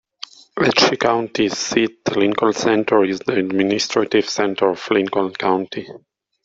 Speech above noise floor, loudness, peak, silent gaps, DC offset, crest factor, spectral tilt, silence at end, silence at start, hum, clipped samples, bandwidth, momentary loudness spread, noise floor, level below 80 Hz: 22 dB; -18 LUFS; 0 dBFS; none; under 0.1%; 18 dB; -4 dB/octave; 0.45 s; 0.55 s; none; under 0.1%; 8 kHz; 8 LU; -40 dBFS; -60 dBFS